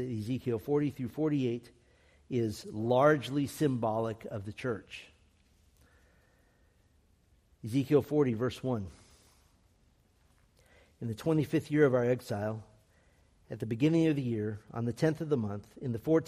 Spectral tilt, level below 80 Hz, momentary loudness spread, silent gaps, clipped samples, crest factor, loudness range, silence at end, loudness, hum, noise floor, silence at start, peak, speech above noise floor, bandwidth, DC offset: -7.5 dB/octave; -66 dBFS; 14 LU; none; under 0.1%; 22 dB; 8 LU; 0 s; -32 LUFS; none; -67 dBFS; 0 s; -12 dBFS; 37 dB; 15 kHz; under 0.1%